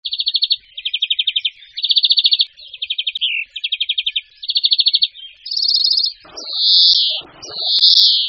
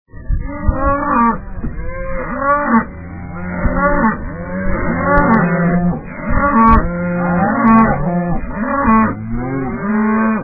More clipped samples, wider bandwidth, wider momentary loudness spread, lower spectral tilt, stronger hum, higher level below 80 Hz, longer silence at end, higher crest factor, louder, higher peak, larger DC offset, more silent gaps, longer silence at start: neither; first, 7 kHz vs 3.3 kHz; about the same, 14 LU vs 13 LU; second, 6 dB/octave vs -12.5 dB/octave; neither; second, -68 dBFS vs -24 dBFS; about the same, 0 s vs 0 s; about the same, 18 dB vs 14 dB; about the same, -14 LUFS vs -15 LUFS; about the same, 0 dBFS vs 0 dBFS; second, under 0.1% vs 0.3%; neither; about the same, 0.05 s vs 0.15 s